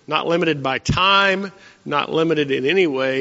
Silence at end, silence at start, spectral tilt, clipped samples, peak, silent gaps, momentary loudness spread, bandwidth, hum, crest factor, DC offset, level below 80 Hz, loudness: 0 s; 0.1 s; -2.5 dB/octave; under 0.1%; -2 dBFS; none; 9 LU; 8 kHz; none; 16 dB; under 0.1%; -44 dBFS; -18 LUFS